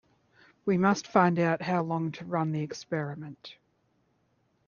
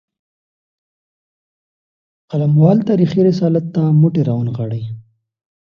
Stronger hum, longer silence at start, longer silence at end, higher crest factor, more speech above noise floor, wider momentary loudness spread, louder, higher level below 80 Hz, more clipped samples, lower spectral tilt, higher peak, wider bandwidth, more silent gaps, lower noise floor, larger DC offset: neither; second, 0.65 s vs 2.3 s; first, 1.15 s vs 0.7 s; first, 22 dB vs 16 dB; second, 43 dB vs over 76 dB; first, 17 LU vs 12 LU; second, -28 LUFS vs -15 LUFS; second, -72 dBFS vs -56 dBFS; neither; second, -6.5 dB/octave vs -10.5 dB/octave; second, -8 dBFS vs 0 dBFS; about the same, 7.2 kHz vs 6.6 kHz; neither; second, -71 dBFS vs under -90 dBFS; neither